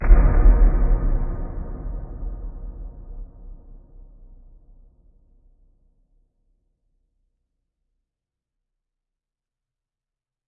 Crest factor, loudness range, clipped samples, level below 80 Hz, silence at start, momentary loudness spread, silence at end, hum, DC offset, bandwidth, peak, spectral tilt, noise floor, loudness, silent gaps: 22 dB; 25 LU; under 0.1%; -22 dBFS; 0 s; 24 LU; 6.9 s; none; under 0.1%; 2.5 kHz; 0 dBFS; -14 dB/octave; -89 dBFS; -23 LUFS; none